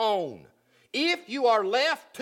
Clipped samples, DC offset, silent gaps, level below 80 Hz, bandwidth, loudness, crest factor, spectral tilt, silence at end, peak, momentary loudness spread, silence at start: under 0.1%; under 0.1%; none; -80 dBFS; 16 kHz; -26 LUFS; 16 dB; -3 dB/octave; 0 s; -12 dBFS; 9 LU; 0 s